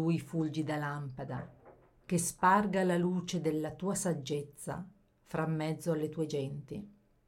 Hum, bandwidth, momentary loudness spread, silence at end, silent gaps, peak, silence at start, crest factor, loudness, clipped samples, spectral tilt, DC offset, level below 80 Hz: none; 16.5 kHz; 15 LU; 0.35 s; none; -14 dBFS; 0 s; 20 dB; -34 LUFS; under 0.1%; -5.5 dB/octave; under 0.1%; -66 dBFS